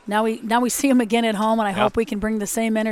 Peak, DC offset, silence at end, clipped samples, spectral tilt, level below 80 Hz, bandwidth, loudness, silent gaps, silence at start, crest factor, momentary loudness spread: -4 dBFS; under 0.1%; 0 s; under 0.1%; -4 dB/octave; -48 dBFS; 17.5 kHz; -20 LUFS; none; 0.05 s; 16 dB; 5 LU